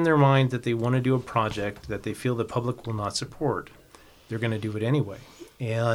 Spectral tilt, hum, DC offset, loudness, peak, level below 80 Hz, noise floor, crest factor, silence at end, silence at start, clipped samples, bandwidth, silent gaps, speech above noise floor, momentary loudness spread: -6.5 dB/octave; none; under 0.1%; -27 LUFS; -8 dBFS; -54 dBFS; -53 dBFS; 18 dB; 0 s; 0 s; under 0.1%; 13.5 kHz; none; 27 dB; 12 LU